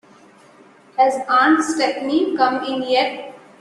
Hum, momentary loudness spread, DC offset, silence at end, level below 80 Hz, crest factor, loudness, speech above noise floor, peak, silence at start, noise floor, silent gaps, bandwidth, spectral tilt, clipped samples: none; 12 LU; under 0.1%; 0.25 s; -66 dBFS; 16 dB; -18 LUFS; 31 dB; -2 dBFS; 0.95 s; -48 dBFS; none; 11.5 kHz; -3 dB/octave; under 0.1%